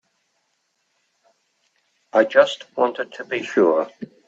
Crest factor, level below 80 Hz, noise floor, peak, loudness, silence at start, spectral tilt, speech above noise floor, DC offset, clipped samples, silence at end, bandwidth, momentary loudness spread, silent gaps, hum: 22 dB; -76 dBFS; -71 dBFS; -2 dBFS; -20 LUFS; 2.15 s; -4.5 dB/octave; 51 dB; under 0.1%; under 0.1%; 0.25 s; 8 kHz; 11 LU; none; none